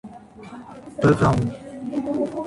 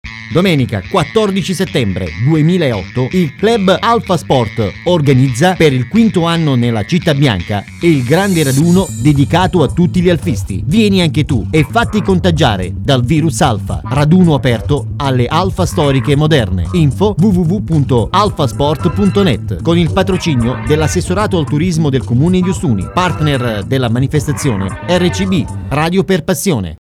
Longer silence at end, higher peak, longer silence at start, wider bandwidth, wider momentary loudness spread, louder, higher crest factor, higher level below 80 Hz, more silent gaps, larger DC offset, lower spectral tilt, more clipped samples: about the same, 0 s vs 0.05 s; second, -6 dBFS vs 0 dBFS; about the same, 0.05 s vs 0.05 s; second, 11.5 kHz vs 15.5 kHz; first, 23 LU vs 5 LU; second, -22 LUFS vs -13 LUFS; first, 18 dB vs 12 dB; second, -44 dBFS vs -30 dBFS; neither; neither; first, -8 dB/octave vs -6 dB/octave; neither